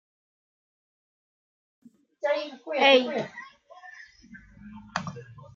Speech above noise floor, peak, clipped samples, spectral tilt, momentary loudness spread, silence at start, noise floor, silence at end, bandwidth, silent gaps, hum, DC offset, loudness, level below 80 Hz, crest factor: 27 dB; -6 dBFS; under 0.1%; -4 dB/octave; 28 LU; 2.25 s; -51 dBFS; 0.1 s; 7.4 kHz; none; none; under 0.1%; -25 LUFS; -66 dBFS; 24 dB